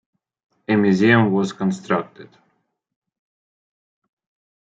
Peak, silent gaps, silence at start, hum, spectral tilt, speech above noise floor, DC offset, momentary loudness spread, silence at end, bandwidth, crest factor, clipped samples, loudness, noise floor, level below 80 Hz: -2 dBFS; none; 0.7 s; none; -7 dB/octave; 51 dB; under 0.1%; 14 LU; 2.4 s; 7.8 kHz; 20 dB; under 0.1%; -18 LUFS; -69 dBFS; -66 dBFS